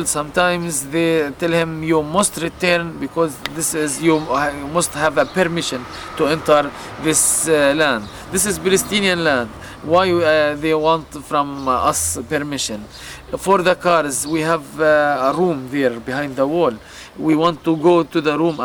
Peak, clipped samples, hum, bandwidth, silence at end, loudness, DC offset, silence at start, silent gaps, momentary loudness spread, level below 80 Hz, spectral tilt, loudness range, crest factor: -2 dBFS; under 0.1%; none; over 20 kHz; 0 s; -17 LUFS; under 0.1%; 0 s; none; 9 LU; -46 dBFS; -3.5 dB/octave; 2 LU; 16 dB